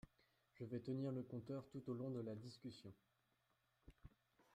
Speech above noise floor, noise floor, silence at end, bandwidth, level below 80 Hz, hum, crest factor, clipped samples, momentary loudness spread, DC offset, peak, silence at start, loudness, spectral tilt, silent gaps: 35 dB; -85 dBFS; 0.15 s; 14 kHz; -76 dBFS; none; 16 dB; under 0.1%; 21 LU; under 0.1%; -36 dBFS; 0.05 s; -50 LUFS; -8.5 dB/octave; none